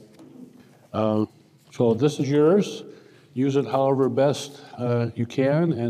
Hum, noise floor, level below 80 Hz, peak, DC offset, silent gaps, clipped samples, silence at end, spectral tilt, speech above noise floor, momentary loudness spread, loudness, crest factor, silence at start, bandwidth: none; -49 dBFS; -70 dBFS; -8 dBFS; under 0.1%; none; under 0.1%; 0 s; -7 dB/octave; 27 dB; 12 LU; -23 LUFS; 16 dB; 0.2 s; 13.5 kHz